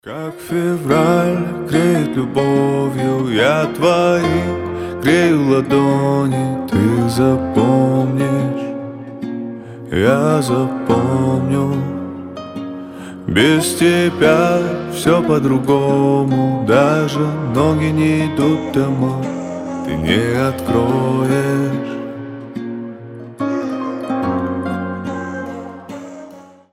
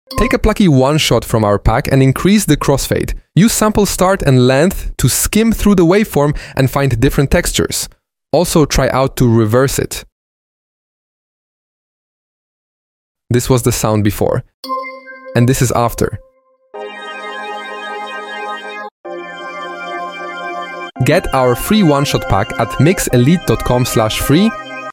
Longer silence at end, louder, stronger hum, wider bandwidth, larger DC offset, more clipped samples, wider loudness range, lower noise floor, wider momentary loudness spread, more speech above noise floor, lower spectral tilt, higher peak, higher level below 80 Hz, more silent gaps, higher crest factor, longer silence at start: first, 0.3 s vs 0 s; second, -16 LUFS vs -13 LUFS; neither; about the same, 16 kHz vs 17 kHz; neither; neither; second, 7 LU vs 12 LU; about the same, -39 dBFS vs -40 dBFS; about the same, 15 LU vs 14 LU; second, 24 dB vs 28 dB; about the same, -6.5 dB/octave vs -5.5 dB/octave; about the same, 0 dBFS vs 0 dBFS; second, -46 dBFS vs -28 dBFS; second, none vs 10.12-13.15 s, 14.54-14.63 s, 18.91-19.04 s; about the same, 16 dB vs 14 dB; about the same, 0.05 s vs 0.1 s